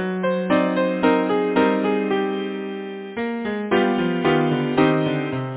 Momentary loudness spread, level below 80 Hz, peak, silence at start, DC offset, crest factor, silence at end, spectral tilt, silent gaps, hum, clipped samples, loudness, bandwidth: 9 LU; -56 dBFS; -4 dBFS; 0 s; under 0.1%; 16 dB; 0 s; -10.5 dB/octave; none; none; under 0.1%; -21 LUFS; 4 kHz